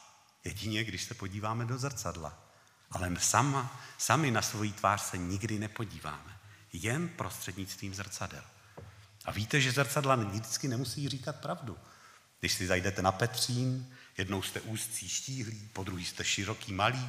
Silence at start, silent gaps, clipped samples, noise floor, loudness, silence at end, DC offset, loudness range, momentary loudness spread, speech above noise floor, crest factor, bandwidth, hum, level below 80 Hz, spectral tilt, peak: 0 s; none; under 0.1%; -59 dBFS; -33 LUFS; 0 s; under 0.1%; 7 LU; 15 LU; 25 dB; 26 dB; 15.5 kHz; none; -62 dBFS; -3.5 dB/octave; -8 dBFS